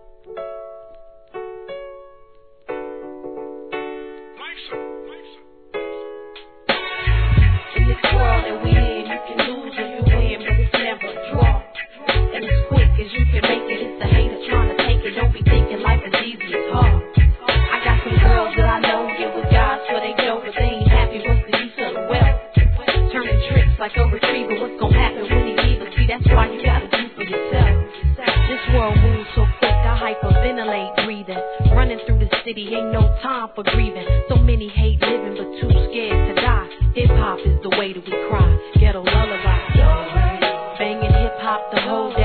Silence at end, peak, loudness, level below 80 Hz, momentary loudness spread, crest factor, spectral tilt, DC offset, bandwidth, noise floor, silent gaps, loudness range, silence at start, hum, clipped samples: 0 s; 0 dBFS; -19 LUFS; -20 dBFS; 14 LU; 16 dB; -9.5 dB/octave; 0.3%; 4.5 kHz; -49 dBFS; none; 11 LU; 0.25 s; none; under 0.1%